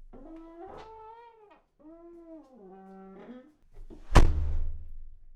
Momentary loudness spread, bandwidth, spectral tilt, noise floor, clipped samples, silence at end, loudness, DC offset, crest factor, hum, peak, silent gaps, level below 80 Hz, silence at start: 27 LU; 10 kHz; -6 dB/octave; -59 dBFS; under 0.1%; 0.3 s; -28 LUFS; under 0.1%; 24 dB; none; -6 dBFS; none; -32 dBFS; 0.3 s